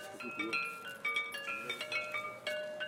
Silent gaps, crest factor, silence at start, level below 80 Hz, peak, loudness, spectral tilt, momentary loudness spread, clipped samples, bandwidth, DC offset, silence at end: none; 18 dB; 0 s; -84 dBFS; -22 dBFS; -37 LUFS; -2 dB/octave; 4 LU; under 0.1%; 16.5 kHz; under 0.1%; 0 s